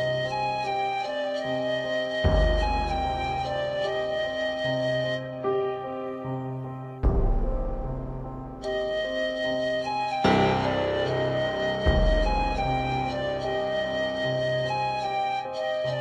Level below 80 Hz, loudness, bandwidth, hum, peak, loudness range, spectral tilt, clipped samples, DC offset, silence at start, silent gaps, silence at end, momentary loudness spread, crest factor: -32 dBFS; -27 LUFS; 9.4 kHz; none; -10 dBFS; 5 LU; -6 dB/octave; under 0.1%; under 0.1%; 0 s; none; 0 s; 9 LU; 18 dB